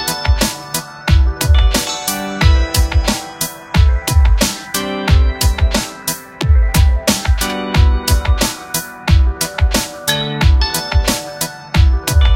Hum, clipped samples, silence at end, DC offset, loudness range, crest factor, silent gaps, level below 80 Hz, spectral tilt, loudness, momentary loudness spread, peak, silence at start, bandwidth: none; under 0.1%; 0 s; under 0.1%; 1 LU; 14 dB; none; -16 dBFS; -4 dB/octave; -15 LUFS; 7 LU; 0 dBFS; 0 s; 17 kHz